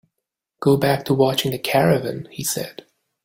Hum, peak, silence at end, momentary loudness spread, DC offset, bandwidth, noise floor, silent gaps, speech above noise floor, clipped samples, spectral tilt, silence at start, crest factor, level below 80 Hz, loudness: none; -2 dBFS; 0.55 s; 10 LU; under 0.1%; 17 kHz; -81 dBFS; none; 62 dB; under 0.1%; -5 dB/octave; 0.6 s; 18 dB; -56 dBFS; -20 LUFS